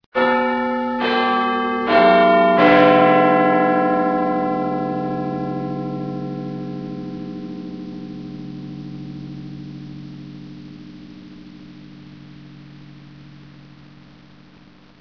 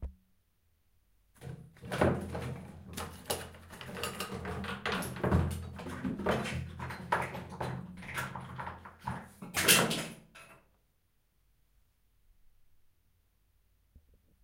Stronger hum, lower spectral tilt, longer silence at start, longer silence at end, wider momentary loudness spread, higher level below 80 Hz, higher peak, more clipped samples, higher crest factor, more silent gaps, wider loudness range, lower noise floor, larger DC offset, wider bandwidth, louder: neither; first, -8 dB/octave vs -3.5 dB/octave; first, 0.15 s vs 0 s; first, 1.2 s vs 0.45 s; first, 25 LU vs 17 LU; second, -58 dBFS vs -52 dBFS; first, 0 dBFS vs -10 dBFS; neither; second, 20 dB vs 28 dB; neither; first, 23 LU vs 7 LU; second, -48 dBFS vs -73 dBFS; first, 0.2% vs under 0.1%; second, 5.4 kHz vs 16.5 kHz; first, -17 LUFS vs -34 LUFS